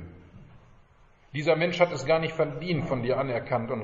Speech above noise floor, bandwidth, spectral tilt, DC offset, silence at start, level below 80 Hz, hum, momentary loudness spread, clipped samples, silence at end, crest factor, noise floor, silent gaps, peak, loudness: 31 dB; 7.6 kHz; -4.5 dB/octave; under 0.1%; 0 s; -54 dBFS; none; 6 LU; under 0.1%; 0 s; 20 dB; -58 dBFS; none; -8 dBFS; -27 LUFS